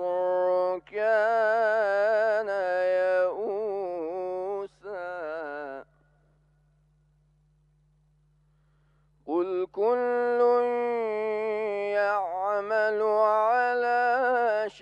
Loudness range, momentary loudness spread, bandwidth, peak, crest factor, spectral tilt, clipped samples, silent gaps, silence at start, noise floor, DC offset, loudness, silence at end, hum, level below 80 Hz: 14 LU; 12 LU; 9.2 kHz; -12 dBFS; 16 dB; -5.5 dB/octave; under 0.1%; none; 0 s; -65 dBFS; under 0.1%; -26 LUFS; 0 s; none; -70 dBFS